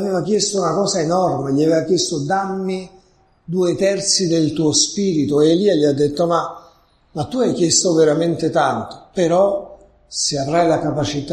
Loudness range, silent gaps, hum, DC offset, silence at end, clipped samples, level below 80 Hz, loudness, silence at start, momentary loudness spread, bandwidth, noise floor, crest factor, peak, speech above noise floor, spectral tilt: 3 LU; none; none; under 0.1%; 0 s; under 0.1%; -50 dBFS; -17 LUFS; 0 s; 10 LU; 12 kHz; -54 dBFS; 16 dB; -2 dBFS; 37 dB; -4 dB/octave